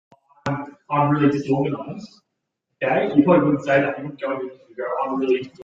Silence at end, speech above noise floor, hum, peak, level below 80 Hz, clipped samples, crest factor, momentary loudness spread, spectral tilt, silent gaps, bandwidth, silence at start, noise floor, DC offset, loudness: 0 s; 57 dB; none; -2 dBFS; -62 dBFS; under 0.1%; 20 dB; 14 LU; -8 dB/octave; none; 7.4 kHz; 0.45 s; -78 dBFS; under 0.1%; -21 LUFS